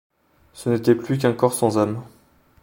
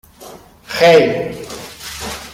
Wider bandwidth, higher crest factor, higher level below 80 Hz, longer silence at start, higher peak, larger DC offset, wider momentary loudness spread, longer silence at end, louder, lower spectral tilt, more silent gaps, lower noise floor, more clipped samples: about the same, 17 kHz vs 16.5 kHz; about the same, 20 dB vs 16 dB; second, -60 dBFS vs -46 dBFS; first, 0.55 s vs 0.2 s; about the same, -2 dBFS vs -2 dBFS; neither; second, 8 LU vs 19 LU; first, 0.55 s vs 0 s; second, -21 LUFS vs -14 LUFS; first, -6 dB/octave vs -4 dB/octave; neither; first, -50 dBFS vs -38 dBFS; neither